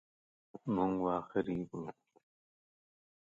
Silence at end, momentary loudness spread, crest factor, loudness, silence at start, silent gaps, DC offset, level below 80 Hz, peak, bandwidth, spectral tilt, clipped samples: 1.4 s; 13 LU; 20 dB; -37 LUFS; 0.55 s; none; under 0.1%; -68 dBFS; -20 dBFS; 7.6 kHz; -9 dB/octave; under 0.1%